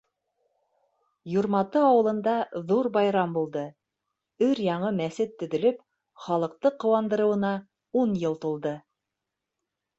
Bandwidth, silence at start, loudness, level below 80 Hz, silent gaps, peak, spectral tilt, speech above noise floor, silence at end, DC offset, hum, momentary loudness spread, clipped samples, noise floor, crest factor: 8 kHz; 1.25 s; -26 LUFS; -70 dBFS; none; -10 dBFS; -7.5 dB/octave; 60 dB; 1.2 s; under 0.1%; none; 10 LU; under 0.1%; -85 dBFS; 16 dB